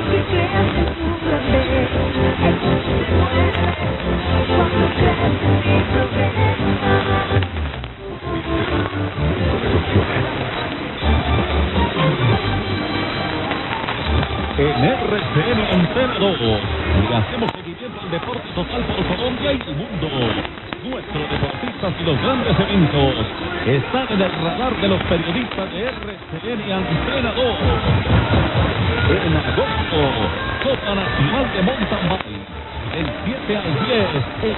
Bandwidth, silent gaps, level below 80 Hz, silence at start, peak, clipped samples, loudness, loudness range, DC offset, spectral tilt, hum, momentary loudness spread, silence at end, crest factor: 4.2 kHz; none; -32 dBFS; 0 s; 0 dBFS; under 0.1%; -19 LUFS; 4 LU; under 0.1%; -10 dB/octave; none; 8 LU; 0 s; 18 dB